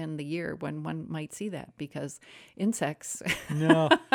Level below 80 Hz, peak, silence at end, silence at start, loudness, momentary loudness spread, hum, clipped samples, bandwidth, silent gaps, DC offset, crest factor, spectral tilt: -64 dBFS; -6 dBFS; 0.1 s; 0 s; -30 LUFS; 16 LU; none; under 0.1%; 19 kHz; none; under 0.1%; 24 dB; -5 dB/octave